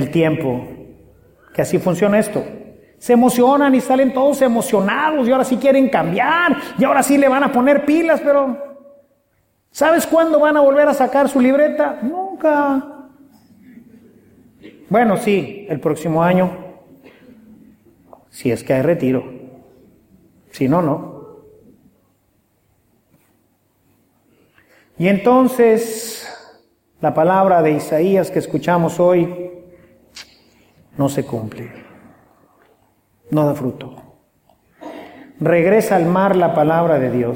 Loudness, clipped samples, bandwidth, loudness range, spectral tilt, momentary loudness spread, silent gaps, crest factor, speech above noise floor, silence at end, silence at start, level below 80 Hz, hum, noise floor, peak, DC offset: -16 LUFS; under 0.1%; 17 kHz; 10 LU; -6 dB/octave; 18 LU; none; 16 dB; 48 dB; 0 s; 0 s; -56 dBFS; none; -63 dBFS; -2 dBFS; under 0.1%